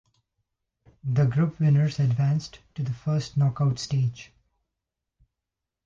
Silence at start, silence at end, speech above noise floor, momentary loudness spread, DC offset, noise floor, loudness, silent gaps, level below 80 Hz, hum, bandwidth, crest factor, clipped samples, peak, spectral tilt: 1.05 s; 1.6 s; 62 dB; 11 LU; under 0.1%; -86 dBFS; -25 LUFS; none; -58 dBFS; none; 7.6 kHz; 14 dB; under 0.1%; -12 dBFS; -7.5 dB/octave